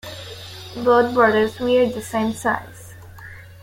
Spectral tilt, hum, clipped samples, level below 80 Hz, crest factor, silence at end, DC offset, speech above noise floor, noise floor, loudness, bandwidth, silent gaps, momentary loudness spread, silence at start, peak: -5 dB/octave; none; under 0.1%; -52 dBFS; 18 dB; 0.1 s; under 0.1%; 21 dB; -39 dBFS; -19 LUFS; 16.5 kHz; none; 23 LU; 0.05 s; -2 dBFS